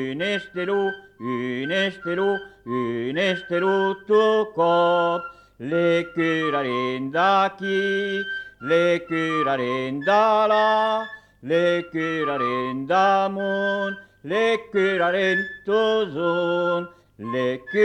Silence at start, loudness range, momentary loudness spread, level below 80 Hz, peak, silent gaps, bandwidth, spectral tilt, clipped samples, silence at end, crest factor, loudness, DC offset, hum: 0 s; 2 LU; 9 LU; -64 dBFS; -8 dBFS; none; 9.6 kHz; -6 dB/octave; under 0.1%; 0 s; 14 dB; -22 LUFS; under 0.1%; none